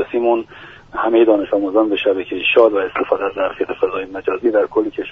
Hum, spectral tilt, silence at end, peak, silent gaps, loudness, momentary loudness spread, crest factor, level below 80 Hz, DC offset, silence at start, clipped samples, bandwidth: none; -2 dB/octave; 0 s; 0 dBFS; none; -17 LUFS; 9 LU; 16 dB; -52 dBFS; under 0.1%; 0 s; under 0.1%; 3.9 kHz